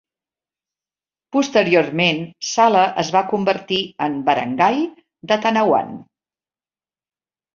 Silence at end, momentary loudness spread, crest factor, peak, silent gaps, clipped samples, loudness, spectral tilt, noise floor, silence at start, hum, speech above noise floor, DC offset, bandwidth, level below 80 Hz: 1.5 s; 8 LU; 18 dB; -2 dBFS; none; under 0.1%; -18 LUFS; -4.5 dB/octave; under -90 dBFS; 1.35 s; none; over 72 dB; under 0.1%; 7.4 kHz; -64 dBFS